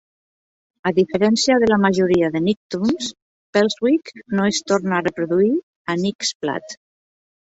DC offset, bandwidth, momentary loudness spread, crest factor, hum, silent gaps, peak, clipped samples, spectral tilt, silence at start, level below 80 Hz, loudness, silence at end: under 0.1%; 8.2 kHz; 10 LU; 16 dB; none; 2.57-2.70 s, 3.22-3.53 s, 5.63-5.85 s, 6.15-6.19 s, 6.35-6.40 s; -4 dBFS; under 0.1%; -5 dB/octave; 0.85 s; -56 dBFS; -19 LUFS; 0.7 s